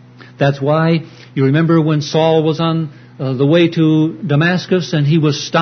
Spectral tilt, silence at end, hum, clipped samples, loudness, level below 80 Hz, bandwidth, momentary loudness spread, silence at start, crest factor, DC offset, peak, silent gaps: -7 dB/octave; 0 s; none; under 0.1%; -14 LUFS; -56 dBFS; 6.6 kHz; 7 LU; 0.2 s; 14 dB; under 0.1%; 0 dBFS; none